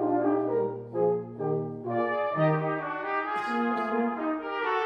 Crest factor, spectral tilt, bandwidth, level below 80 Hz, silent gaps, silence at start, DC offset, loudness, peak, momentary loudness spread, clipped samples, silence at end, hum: 14 dB; -8.5 dB/octave; 8.2 kHz; -72 dBFS; none; 0 s; under 0.1%; -29 LUFS; -14 dBFS; 5 LU; under 0.1%; 0 s; none